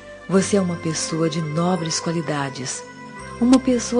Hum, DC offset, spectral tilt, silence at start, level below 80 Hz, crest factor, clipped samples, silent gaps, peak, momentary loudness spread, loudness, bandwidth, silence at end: none; under 0.1%; -5 dB/octave; 0 s; -50 dBFS; 20 dB; under 0.1%; none; -2 dBFS; 13 LU; -21 LUFS; 10 kHz; 0 s